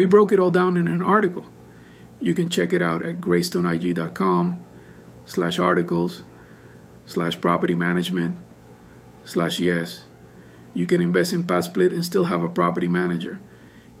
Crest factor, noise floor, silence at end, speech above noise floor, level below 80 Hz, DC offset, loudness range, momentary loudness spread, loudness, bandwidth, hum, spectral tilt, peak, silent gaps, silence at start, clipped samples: 20 dB; -47 dBFS; 0.2 s; 26 dB; -60 dBFS; under 0.1%; 4 LU; 10 LU; -22 LUFS; 15.5 kHz; none; -6.5 dB/octave; -4 dBFS; none; 0 s; under 0.1%